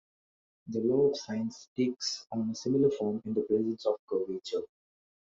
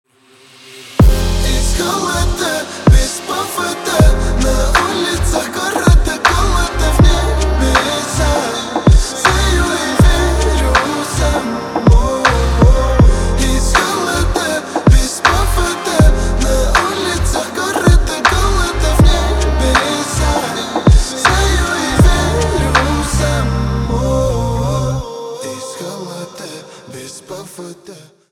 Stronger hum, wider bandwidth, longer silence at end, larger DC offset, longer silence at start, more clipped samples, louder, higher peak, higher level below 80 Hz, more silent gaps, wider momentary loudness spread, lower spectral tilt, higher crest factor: neither; second, 7.8 kHz vs 16 kHz; first, 0.65 s vs 0.35 s; neither; about the same, 0.65 s vs 0.65 s; neither; second, -31 LUFS vs -14 LUFS; second, -14 dBFS vs 0 dBFS; second, -72 dBFS vs -16 dBFS; first, 1.68-1.76 s, 3.99-4.08 s vs none; second, 9 LU vs 13 LU; about the same, -5.5 dB/octave vs -4.5 dB/octave; about the same, 16 dB vs 12 dB